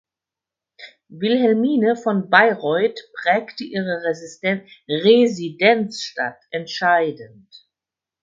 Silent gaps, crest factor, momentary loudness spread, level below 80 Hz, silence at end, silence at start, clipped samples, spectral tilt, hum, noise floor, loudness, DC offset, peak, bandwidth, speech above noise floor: none; 20 dB; 12 LU; -70 dBFS; 0.95 s; 0.8 s; under 0.1%; -5.5 dB/octave; none; -88 dBFS; -19 LUFS; under 0.1%; 0 dBFS; 7.6 kHz; 69 dB